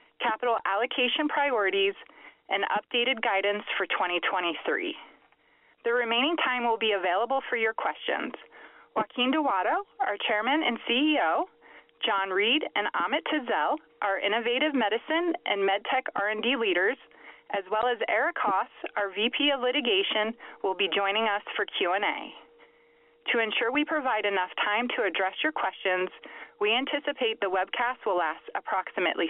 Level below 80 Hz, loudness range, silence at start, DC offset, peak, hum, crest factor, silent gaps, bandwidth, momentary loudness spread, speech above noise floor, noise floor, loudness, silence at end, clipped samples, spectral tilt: -78 dBFS; 2 LU; 0.2 s; under 0.1%; -12 dBFS; none; 16 dB; none; 4 kHz; 7 LU; 36 dB; -64 dBFS; -27 LUFS; 0 s; under 0.1%; 1 dB/octave